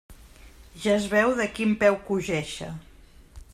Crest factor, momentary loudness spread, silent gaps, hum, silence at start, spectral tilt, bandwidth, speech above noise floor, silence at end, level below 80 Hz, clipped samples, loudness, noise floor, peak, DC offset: 20 dB; 14 LU; none; none; 0.1 s; -5 dB/octave; 14 kHz; 25 dB; 0.1 s; -50 dBFS; under 0.1%; -25 LUFS; -49 dBFS; -6 dBFS; under 0.1%